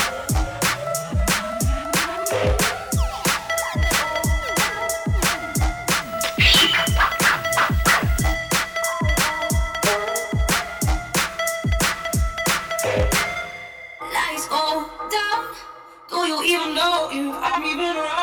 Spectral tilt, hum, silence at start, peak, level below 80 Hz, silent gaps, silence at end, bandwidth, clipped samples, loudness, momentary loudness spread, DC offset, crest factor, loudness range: -3 dB/octave; none; 0 s; -4 dBFS; -30 dBFS; none; 0 s; over 20 kHz; under 0.1%; -20 LUFS; 7 LU; under 0.1%; 18 dB; 5 LU